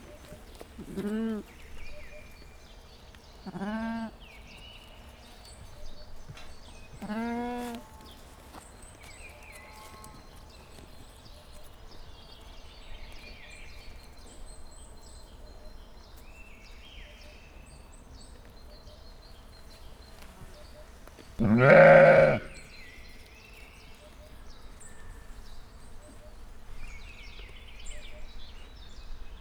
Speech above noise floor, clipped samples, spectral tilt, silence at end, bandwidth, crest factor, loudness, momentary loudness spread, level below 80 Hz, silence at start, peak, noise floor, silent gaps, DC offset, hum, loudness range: 31 dB; under 0.1%; -6.5 dB/octave; 0 s; 15 kHz; 26 dB; -23 LUFS; 18 LU; -48 dBFS; 0.1 s; -6 dBFS; -51 dBFS; none; under 0.1%; none; 29 LU